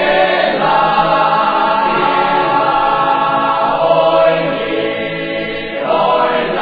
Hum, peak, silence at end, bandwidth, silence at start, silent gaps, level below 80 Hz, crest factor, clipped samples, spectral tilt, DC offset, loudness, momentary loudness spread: none; 0 dBFS; 0 s; 5 kHz; 0 s; none; -42 dBFS; 12 dB; under 0.1%; -7 dB/octave; under 0.1%; -13 LUFS; 7 LU